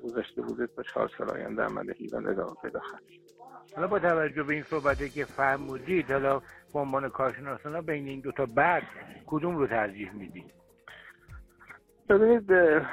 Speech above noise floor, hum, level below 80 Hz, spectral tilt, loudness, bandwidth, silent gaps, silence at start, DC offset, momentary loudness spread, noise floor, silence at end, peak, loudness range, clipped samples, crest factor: 25 dB; none; -56 dBFS; -7.5 dB/octave; -29 LUFS; 13.5 kHz; none; 0 s; under 0.1%; 21 LU; -54 dBFS; 0 s; -10 dBFS; 5 LU; under 0.1%; 18 dB